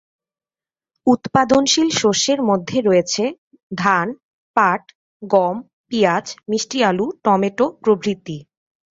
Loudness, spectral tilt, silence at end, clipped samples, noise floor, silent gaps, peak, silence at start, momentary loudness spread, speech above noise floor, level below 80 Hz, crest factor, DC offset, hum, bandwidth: -18 LUFS; -4 dB/octave; 0.5 s; under 0.1%; under -90 dBFS; 3.38-3.51 s, 3.63-3.70 s, 4.23-4.54 s, 4.95-5.20 s, 5.73-5.84 s; -2 dBFS; 1.05 s; 11 LU; over 73 dB; -58 dBFS; 18 dB; under 0.1%; none; 8 kHz